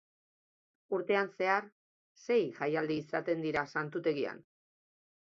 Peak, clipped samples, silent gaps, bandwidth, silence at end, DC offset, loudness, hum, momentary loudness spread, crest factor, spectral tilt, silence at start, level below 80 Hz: -14 dBFS; under 0.1%; 1.72-2.15 s; 7.2 kHz; 0.8 s; under 0.1%; -34 LUFS; none; 7 LU; 20 dB; -6 dB/octave; 0.9 s; -76 dBFS